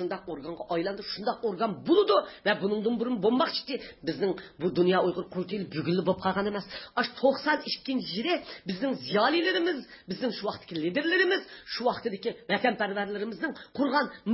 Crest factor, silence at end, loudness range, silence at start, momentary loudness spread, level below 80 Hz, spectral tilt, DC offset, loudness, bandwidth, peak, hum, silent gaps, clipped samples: 18 dB; 0 s; 2 LU; 0 s; 10 LU; -66 dBFS; -9 dB/octave; under 0.1%; -29 LUFS; 5.8 kHz; -10 dBFS; none; none; under 0.1%